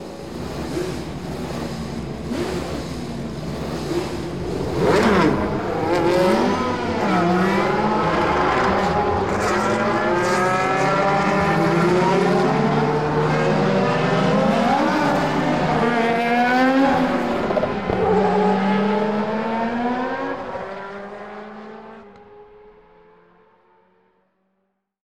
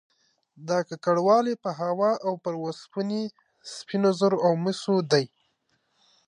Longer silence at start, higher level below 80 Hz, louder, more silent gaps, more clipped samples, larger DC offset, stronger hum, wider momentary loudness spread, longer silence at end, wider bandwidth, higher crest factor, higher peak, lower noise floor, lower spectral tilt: second, 0 s vs 0.6 s; first, -42 dBFS vs -80 dBFS; first, -20 LUFS vs -25 LUFS; neither; neither; first, 0.6% vs under 0.1%; neither; second, 12 LU vs 15 LU; first, 2.25 s vs 1.05 s; first, 15.5 kHz vs 11 kHz; about the same, 14 dB vs 18 dB; about the same, -6 dBFS vs -8 dBFS; about the same, -72 dBFS vs -72 dBFS; about the same, -6 dB/octave vs -6 dB/octave